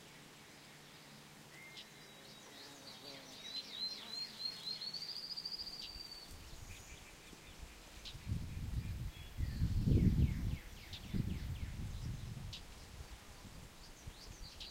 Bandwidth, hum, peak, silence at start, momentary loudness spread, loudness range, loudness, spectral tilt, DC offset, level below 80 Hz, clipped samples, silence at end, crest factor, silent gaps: 16 kHz; none; -20 dBFS; 0 s; 17 LU; 11 LU; -43 LUFS; -5 dB/octave; under 0.1%; -48 dBFS; under 0.1%; 0 s; 24 dB; none